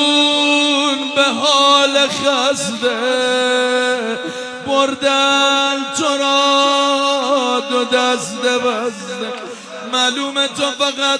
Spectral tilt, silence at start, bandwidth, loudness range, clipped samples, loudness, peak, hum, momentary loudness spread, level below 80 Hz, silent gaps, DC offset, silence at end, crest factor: -1.5 dB/octave; 0 s; 11 kHz; 4 LU; under 0.1%; -15 LUFS; 0 dBFS; none; 11 LU; -66 dBFS; none; under 0.1%; 0 s; 16 dB